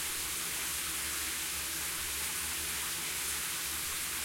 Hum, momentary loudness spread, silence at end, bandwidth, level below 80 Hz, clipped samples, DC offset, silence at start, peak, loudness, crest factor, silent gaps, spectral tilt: none; 1 LU; 0 s; 16.5 kHz; -56 dBFS; under 0.1%; under 0.1%; 0 s; -24 dBFS; -33 LUFS; 14 dB; none; 0 dB/octave